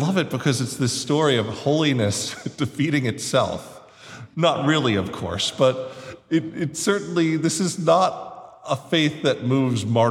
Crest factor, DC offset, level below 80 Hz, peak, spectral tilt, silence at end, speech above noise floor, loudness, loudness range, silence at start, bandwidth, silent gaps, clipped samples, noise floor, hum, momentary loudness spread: 18 dB; under 0.1%; -58 dBFS; -4 dBFS; -5 dB/octave; 0 s; 20 dB; -22 LUFS; 2 LU; 0 s; 16 kHz; none; under 0.1%; -42 dBFS; none; 13 LU